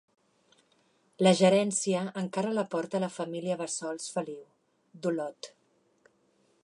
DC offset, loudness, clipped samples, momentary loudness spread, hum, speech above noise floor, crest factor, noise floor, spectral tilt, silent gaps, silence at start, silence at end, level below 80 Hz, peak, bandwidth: under 0.1%; -29 LUFS; under 0.1%; 16 LU; none; 40 dB; 20 dB; -69 dBFS; -4.5 dB/octave; none; 1.2 s; 1.2 s; -80 dBFS; -10 dBFS; 11 kHz